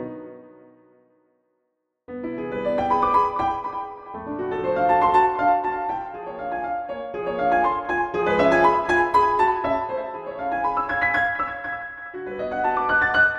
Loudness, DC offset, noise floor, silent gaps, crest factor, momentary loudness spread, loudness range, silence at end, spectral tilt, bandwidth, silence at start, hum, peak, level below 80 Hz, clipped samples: -22 LUFS; under 0.1%; -75 dBFS; none; 16 dB; 15 LU; 5 LU; 0 s; -6 dB/octave; 10.5 kHz; 0 s; none; -6 dBFS; -50 dBFS; under 0.1%